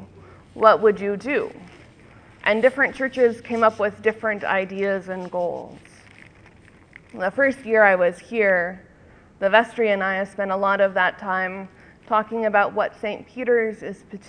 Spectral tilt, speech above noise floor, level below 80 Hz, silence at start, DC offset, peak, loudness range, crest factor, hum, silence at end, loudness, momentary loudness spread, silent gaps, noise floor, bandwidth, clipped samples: -6 dB/octave; 29 dB; -60 dBFS; 0 s; under 0.1%; 0 dBFS; 5 LU; 22 dB; none; 0.1 s; -21 LUFS; 12 LU; none; -50 dBFS; 10 kHz; under 0.1%